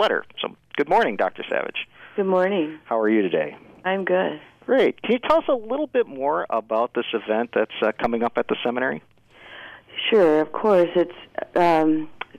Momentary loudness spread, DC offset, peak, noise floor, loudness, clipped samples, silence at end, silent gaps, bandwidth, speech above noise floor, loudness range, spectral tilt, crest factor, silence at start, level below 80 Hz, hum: 12 LU; under 0.1%; -10 dBFS; -43 dBFS; -22 LUFS; under 0.1%; 0.15 s; none; 10.5 kHz; 21 dB; 3 LU; -6.5 dB/octave; 12 dB; 0 s; -60 dBFS; none